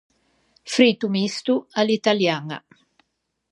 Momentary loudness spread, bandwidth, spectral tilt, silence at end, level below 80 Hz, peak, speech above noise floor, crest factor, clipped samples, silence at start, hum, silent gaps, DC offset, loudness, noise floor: 11 LU; 11.5 kHz; -4.5 dB/octave; 0.95 s; -74 dBFS; -2 dBFS; 55 dB; 20 dB; under 0.1%; 0.65 s; none; none; under 0.1%; -21 LUFS; -76 dBFS